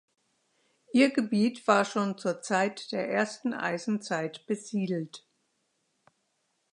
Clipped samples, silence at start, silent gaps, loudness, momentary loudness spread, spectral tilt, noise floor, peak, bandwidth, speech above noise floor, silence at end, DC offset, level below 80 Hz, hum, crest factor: under 0.1%; 0.95 s; none; -29 LUFS; 9 LU; -5 dB/octave; -76 dBFS; -8 dBFS; 11 kHz; 48 dB; 1.55 s; under 0.1%; -80 dBFS; none; 24 dB